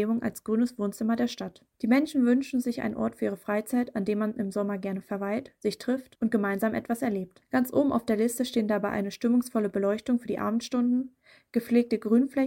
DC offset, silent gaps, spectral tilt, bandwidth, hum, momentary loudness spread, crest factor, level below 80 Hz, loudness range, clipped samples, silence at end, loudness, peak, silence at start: under 0.1%; none; -6 dB/octave; 17 kHz; none; 8 LU; 16 dB; -64 dBFS; 3 LU; under 0.1%; 0 s; -28 LUFS; -12 dBFS; 0 s